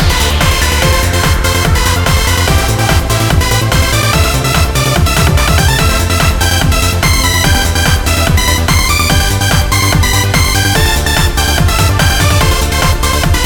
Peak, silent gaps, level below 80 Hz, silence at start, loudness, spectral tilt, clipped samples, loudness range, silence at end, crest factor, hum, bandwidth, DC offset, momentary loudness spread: 0 dBFS; none; -16 dBFS; 0 s; -10 LUFS; -3.5 dB/octave; under 0.1%; 1 LU; 0 s; 10 dB; none; over 20 kHz; 1%; 2 LU